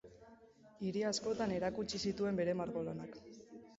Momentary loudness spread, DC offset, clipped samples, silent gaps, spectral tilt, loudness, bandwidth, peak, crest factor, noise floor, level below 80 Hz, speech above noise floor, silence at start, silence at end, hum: 19 LU; under 0.1%; under 0.1%; none; -5 dB/octave; -39 LUFS; 7.6 kHz; -24 dBFS; 16 dB; -62 dBFS; -68 dBFS; 24 dB; 0.05 s; 0 s; none